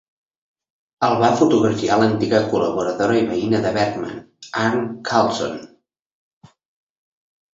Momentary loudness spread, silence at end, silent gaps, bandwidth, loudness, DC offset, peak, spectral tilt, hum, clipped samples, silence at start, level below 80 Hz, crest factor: 12 LU; 1.9 s; none; 7.8 kHz; -19 LUFS; under 0.1%; -2 dBFS; -5.5 dB/octave; none; under 0.1%; 1 s; -56 dBFS; 18 dB